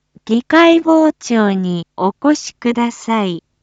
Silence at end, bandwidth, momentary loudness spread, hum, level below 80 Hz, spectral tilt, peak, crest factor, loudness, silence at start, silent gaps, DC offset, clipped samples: 0.25 s; 8 kHz; 9 LU; none; -60 dBFS; -5.5 dB/octave; 0 dBFS; 14 dB; -14 LUFS; 0.25 s; none; under 0.1%; under 0.1%